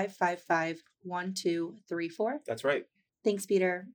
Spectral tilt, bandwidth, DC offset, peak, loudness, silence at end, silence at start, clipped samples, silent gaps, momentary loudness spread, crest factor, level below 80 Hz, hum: -5 dB/octave; over 20 kHz; under 0.1%; -12 dBFS; -32 LUFS; 0 s; 0 s; under 0.1%; none; 8 LU; 20 dB; -88 dBFS; none